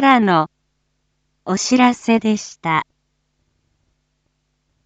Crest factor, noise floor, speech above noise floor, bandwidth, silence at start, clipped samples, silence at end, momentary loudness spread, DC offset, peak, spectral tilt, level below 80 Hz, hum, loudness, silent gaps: 20 dB; -69 dBFS; 53 dB; 8.2 kHz; 0 s; under 0.1%; 2.05 s; 13 LU; under 0.1%; 0 dBFS; -4.5 dB/octave; -62 dBFS; none; -17 LUFS; none